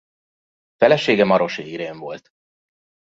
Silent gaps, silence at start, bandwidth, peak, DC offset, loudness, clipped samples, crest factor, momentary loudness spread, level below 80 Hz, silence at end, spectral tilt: none; 0.8 s; 7.8 kHz; 0 dBFS; under 0.1%; -18 LUFS; under 0.1%; 22 dB; 18 LU; -64 dBFS; 0.95 s; -6 dB/octave